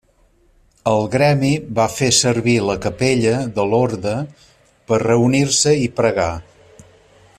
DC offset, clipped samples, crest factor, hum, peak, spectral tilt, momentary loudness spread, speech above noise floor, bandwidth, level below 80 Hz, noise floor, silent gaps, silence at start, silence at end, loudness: under 0.1%; under 0.1%; 16 dB; none; -2 dBFS; -4.5 dB/octave; 9 LU; 39 dB; 14.5 kHz; -48 dBFS; -56 dBFS; none; 0.85 s; 0.95 s; -17 LUFS